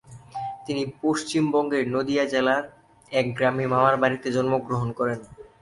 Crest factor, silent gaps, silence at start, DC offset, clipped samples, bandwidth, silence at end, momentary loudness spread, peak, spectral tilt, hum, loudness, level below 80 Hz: 20 dB; none; 0.1 s; under 0.1%; under 0.1%; 11.5 kHz; 0.15 s; 13 LU; -6 dBFS; -5.5 dB/octave; none; -24 LUFS; -60 dBFS